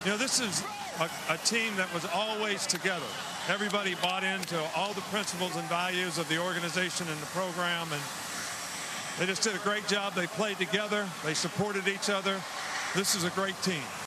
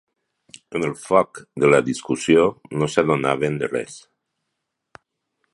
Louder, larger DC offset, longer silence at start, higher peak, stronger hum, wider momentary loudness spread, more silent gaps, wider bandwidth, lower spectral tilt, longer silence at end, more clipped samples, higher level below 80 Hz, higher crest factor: second, -30 LUFS vs -20 LUFS; neither; second, 0 s vs 0.7 s; second, -14 dBFS vs 0 dBFS; neither; second, 7 LU vs 11 LU; neither; first, 14 kHz vs 11.5 kHz; second, -2.5 dB/octave vs -5.5 dB/octave; second, 0 s vs 1.55 s; neither; second, -74 dBFS vs -56 dBFS; about the same, 18 dB vs 22 dB